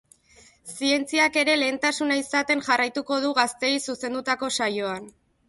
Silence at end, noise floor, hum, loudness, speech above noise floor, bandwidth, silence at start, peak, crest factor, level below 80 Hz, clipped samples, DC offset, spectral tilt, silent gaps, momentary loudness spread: 0.4 s; -56 dBFS; none; -23 LUFS; 31 dB; 12 kHz; 0.65 s; -6 dBFS; 18 dB; -66 dBFS; under 0.1%; under 0.1%; -2 dB/octave; none; 9 LU